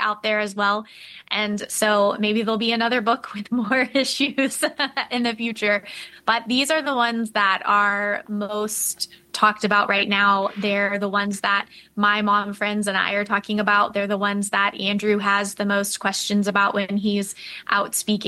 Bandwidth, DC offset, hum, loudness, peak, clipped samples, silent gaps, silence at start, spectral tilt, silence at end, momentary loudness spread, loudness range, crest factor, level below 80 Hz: 13 kHz; under 0.1%; none; -21 LUFS; -4 dBFS; under 0.1%; none; 0 s; -3 dB/octave; 0 s; 7 LU; 2 LU; 18 dB; -66 dBFS